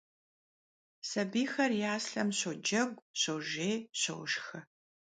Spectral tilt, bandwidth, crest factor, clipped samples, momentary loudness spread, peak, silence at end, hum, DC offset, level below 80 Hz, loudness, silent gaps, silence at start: -3 dB/octave; 9.6 kHz; 18 dB; under 0.1%; 6 LU; -18 dBFS; 0.5 s; none; under 0.1%; -82 dBFS; -34 LUFS; 3.02-3.14 s; 1.05 s